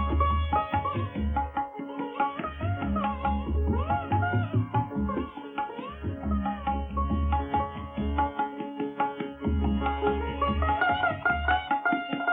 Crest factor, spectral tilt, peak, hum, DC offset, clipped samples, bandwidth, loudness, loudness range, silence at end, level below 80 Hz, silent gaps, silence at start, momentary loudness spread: 16 dB; -10 dB/octave; -12 dBFS; none; under 0.1%; under 0.1%; 3.9 kHz; -29 LUFS; 3 LU; 0 s; -34 dBFS; none; 0 s; 8 LU